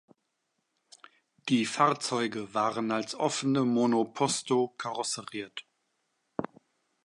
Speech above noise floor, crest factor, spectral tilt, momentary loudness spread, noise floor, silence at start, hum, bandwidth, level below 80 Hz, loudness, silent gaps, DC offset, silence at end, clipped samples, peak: 51 dB; 22 dB; -4 dB/octave; 13 LU; -80 dBFS; 1.45 s; none; 11.5 kHz; -76 dBFS; -29 LUFS; none; under 0.1%; 0.6 s; under 0.1%; -10 dBFS